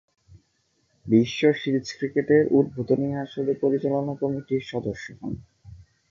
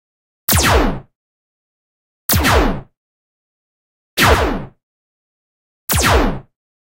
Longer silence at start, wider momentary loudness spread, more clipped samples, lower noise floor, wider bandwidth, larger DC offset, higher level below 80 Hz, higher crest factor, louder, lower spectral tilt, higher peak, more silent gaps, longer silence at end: first, 1.05 s vs 0.5 s; about the same, 15 LU vs 16 LU; neither; second, -69 dBFS vs under -90 dBFS; second, 7.4 kHz vs 16 kHz; neither; second, -58 dBFS vs -26 dBFS; about the same, 18 dB vs 18 dB; second, -24 LUFS vs -15 LUFS; first, -7 dB/octave vs -3.5 dB/octave; second, -6 dBFS vs 0 dBFS; second, none vs 1.15-2.29 s, 2.97-4.17 s, 4.83-5.88 s; second, 0.35 s vs 0.5 s